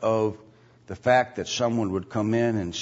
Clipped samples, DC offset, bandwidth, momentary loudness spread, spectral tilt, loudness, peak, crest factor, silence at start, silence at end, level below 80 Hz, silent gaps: under 0.1%; under 0.1%; 8 kHz; 8 LU; -5.5 dB/octave; -25 LUFS; -8 dBFS; 18 dB; 0 s; 0 s; -58 dBFS; none